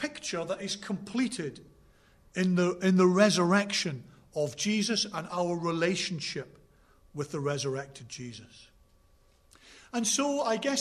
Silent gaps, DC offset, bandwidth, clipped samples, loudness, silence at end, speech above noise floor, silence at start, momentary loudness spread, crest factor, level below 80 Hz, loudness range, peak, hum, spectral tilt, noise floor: none; under 0.1%; 13.5 kHz; under 0.1%; -29 LUFS; 0 s; 34 dB; 0 s; 17 LU; 20 dB; -66 dBFS; 11 LU; -10 dBFS; none; -4.5 dB/octave; -63 dBFS